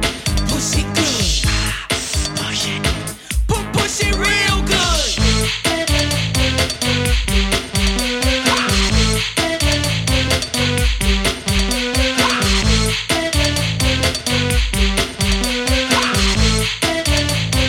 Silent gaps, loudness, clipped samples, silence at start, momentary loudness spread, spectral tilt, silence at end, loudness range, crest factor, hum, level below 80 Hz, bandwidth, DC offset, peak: none; -16 LUFS; under 0.1%; 0 s; 4 LU; -3.5 dB/octave; 0 s; 2 LU; 16 dB; none; -22 dBFS; 17 kHz; under 0.1%; -2 dBFS